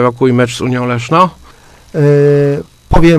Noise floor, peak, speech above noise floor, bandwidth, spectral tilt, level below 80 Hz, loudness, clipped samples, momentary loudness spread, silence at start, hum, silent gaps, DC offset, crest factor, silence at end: -39 dBFS; 0 dBFS; 30 dB; 13.5 kHz; -7 dB/octave; -26 dBFS; -11 LUFS; 0.4%; 7 LU; 0 s; none; none; under 0.1%; 10 dB; 0 s